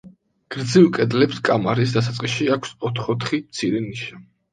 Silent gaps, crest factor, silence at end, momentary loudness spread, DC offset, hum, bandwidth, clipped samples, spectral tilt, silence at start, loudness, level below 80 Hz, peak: none; 18 dB; 0.3 s; 14 LU; under 0.1%; none; 9.4 kHz; under 0.1%; -6 dB/octave; 0.05 s; -20 LUFS; -58 dBFS; -2 dBFS